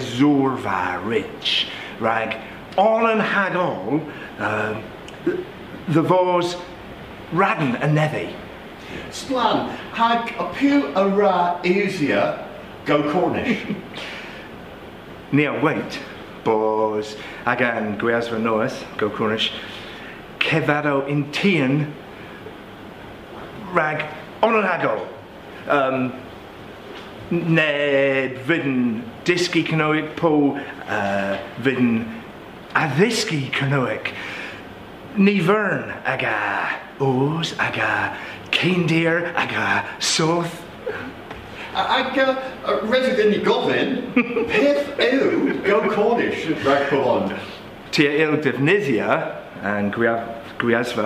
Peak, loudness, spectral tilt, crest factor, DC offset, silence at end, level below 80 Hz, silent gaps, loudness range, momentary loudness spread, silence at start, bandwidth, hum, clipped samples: -2 dBFS; -21 LUFS; -5.5 dB/octave; 20 dB; under 0.1%; 0 s; -54 dBFS; none; 4 LU; 18 LU; 0 s; 15.5 kHz; none; under 0.1%